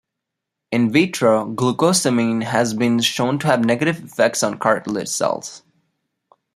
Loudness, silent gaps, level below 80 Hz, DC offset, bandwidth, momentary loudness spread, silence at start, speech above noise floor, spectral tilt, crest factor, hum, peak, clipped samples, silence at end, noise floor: -18 LUFS; none; -62 dBFS; under 0.1%; 15 kHz; 6 LU; 0.7 s; 63 dB; -4.5 dB/octave; 18 dB; none; 0 dBFS; under 0.1%; 0.95 s; -81 dBFS